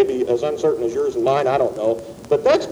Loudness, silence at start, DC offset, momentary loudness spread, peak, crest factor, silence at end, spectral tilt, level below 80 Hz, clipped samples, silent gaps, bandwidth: -20 LUFS; 0 s; under 0.1%; 5 LU; -2 dBFS; 16 dB; 0 s; -6 dB/octave; -52 dBFS; under 0.1%; none; 13 kHz